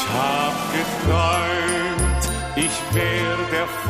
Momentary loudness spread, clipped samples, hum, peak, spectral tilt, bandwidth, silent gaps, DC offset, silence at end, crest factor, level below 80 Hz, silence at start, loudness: 4 LU; under 0.1%; none; -6 dBFS; -4 dB/octave; 15.5 kHz; none; 0.1%; 0 s; 14 dB; -32 dBFS; 0 s; -21 LUFS